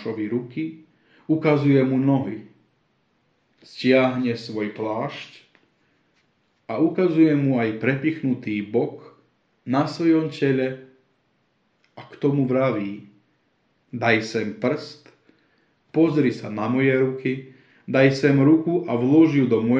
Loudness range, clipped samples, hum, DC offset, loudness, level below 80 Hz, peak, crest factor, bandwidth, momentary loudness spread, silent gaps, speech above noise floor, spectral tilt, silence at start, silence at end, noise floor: 5 LU; under 0.1%; none; under 0.1%; -21 LUFS; -68 dBFS; -4 dBFS; 18 dB; 7.6 kHz; 14 LU; none; 47 dB; -8 dB/octave; 0 s; 0 s; -67 dBFS